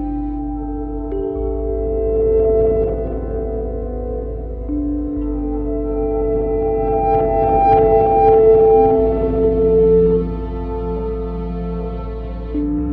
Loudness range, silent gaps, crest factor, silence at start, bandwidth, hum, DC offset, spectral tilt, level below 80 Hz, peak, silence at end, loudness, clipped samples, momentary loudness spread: 9 LU; none; 14 dB; 0 s; 3.8 kHz; none; under 0.1%; -12 dB/octave; -26 dBFS; -2 dBFS; 0 s; -17 LUFS; under 0.1%; 13 LU